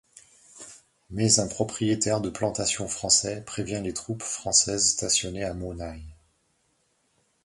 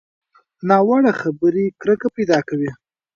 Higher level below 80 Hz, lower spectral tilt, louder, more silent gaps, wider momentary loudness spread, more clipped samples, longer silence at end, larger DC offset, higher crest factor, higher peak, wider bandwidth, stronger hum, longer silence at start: first, -50 dBFS vs -62 dBFS; second, -3 dB/octave vs -7 dB/octave; second, -25 LUFS vs -18 LUFS; neither; first, 18 LU vs 10 LU; neither; first, 1.3 s vs 0.4 s; neither; first, 24 dB vs 18 dB; second, -4 dBFS vs 0 dBFS; first, 11.5 kHz vs 7.4 kHz; neither; about the same, 0.55 s vs 0.65 s